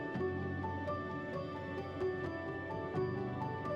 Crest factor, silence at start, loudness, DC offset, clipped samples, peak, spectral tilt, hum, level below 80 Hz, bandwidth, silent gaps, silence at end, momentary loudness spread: 12 dB; 0 s; -40 LUFS; under 0.1%; under 0.1%; -26 dBFS; -8.5 dB/octave; none; -66 dBFS; 7.4 kHz; none; 0 s; 4 LU